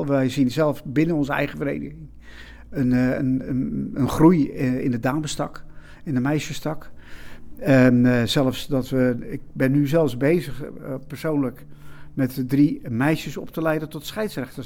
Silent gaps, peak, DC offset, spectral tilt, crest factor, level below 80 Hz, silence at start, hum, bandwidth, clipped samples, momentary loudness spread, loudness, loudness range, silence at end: none; -4 dBFS; under 0.1%; -7 dB/octave; 18 dB; -44 dBFS; 0 s; none; 17 kHz; under 0.1%; 15 LU; -22 LUFS; 4 LU; 0 s